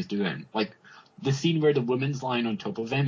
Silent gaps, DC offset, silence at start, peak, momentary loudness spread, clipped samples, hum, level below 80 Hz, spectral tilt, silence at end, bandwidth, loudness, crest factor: none; under 0.1%; 0 s; -12 dBFS; 8 LU; under 0.1%; none; -68 dBFS; -6.5 dB/octave; 0 s; 7.6 kHz; -28 LUFS; 16 dB